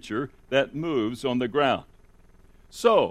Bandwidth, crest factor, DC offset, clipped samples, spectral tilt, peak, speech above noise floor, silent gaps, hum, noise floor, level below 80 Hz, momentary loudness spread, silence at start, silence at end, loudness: 15 kHz; 18 dB; under 0.1%; under 0.1%; -5.5 dB/octave; -8 dBFS; 29 dB; none; none; -54 dBFS; -56 dBFS; 10 LU; 0.05 s; 0 s; -25 LUFS